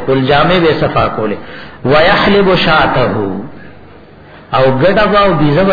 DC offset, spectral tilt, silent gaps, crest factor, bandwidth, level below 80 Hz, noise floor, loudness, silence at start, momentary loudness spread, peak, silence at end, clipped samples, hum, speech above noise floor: under 0.1%; -8 dB/octave; none; 10 dB; 5.4 kHz; -32 dBFS; -36 dBFS; -10 LUFS; 0 s; 12 LU; 0 dBFS; 0 s; under 0.1%; none; 26 dB